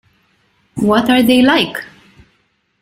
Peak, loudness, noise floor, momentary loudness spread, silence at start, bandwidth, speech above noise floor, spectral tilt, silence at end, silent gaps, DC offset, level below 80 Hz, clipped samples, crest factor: 0 dBFS; -12 LUFS; -61 dBFS; 16 LU; 0.75 s; 16 kHz; 50 dB; -5 dB/octave; 1 s; none; under 0.1%; -50 dBFS; under 0.1%; 14 dB